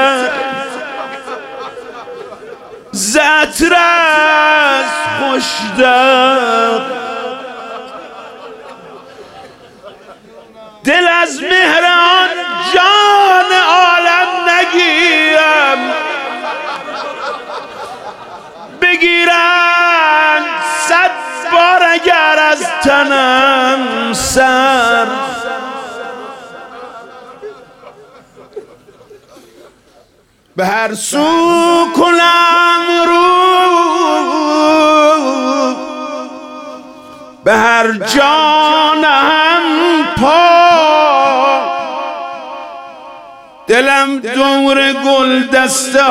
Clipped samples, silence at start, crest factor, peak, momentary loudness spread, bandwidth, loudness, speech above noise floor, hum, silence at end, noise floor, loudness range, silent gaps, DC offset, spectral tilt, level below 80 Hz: under 0.1%; 0 s; 12 dB; 0 dBFS; 19 LU; 16.5 kHz; -10 LUFS; 41 dB; none; 0 s; -51 dBFS; 10 LU; none; under 0.1%; -2 dB/octave; -48 dBFS